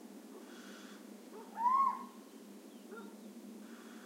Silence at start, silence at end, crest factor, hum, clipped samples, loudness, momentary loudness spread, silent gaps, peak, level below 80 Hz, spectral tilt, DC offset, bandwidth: 0 s; 0 s; 18 dB; none; under 0.1%; -35 LUFS; 22 LU; none; -22 dBFS; under -90 dBFS; -4 dB/octave; under 0.1%; 16 kHz